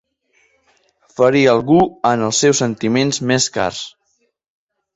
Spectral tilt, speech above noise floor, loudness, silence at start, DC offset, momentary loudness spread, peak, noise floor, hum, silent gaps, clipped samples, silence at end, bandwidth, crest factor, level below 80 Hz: -4 dB/octave; 51 dB; -15 LUFS; 1.2 s; under 0.1%; 10 LU; -2 dBFS; -66 dBFS; none; none; under 0.1%; 1.05 s; 8.4 kHz; 16 dB; -52 dBFS